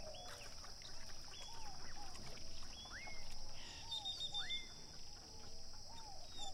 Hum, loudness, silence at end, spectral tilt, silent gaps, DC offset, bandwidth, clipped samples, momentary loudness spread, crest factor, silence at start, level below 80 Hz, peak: none; -49 LUFS; 0 s; -1.5 dB/octave; none; under 0.1%; 13 kHz; under 0.1%; 11 LU; 14 dB; 0 s; -54 dBFS; -32 dBFS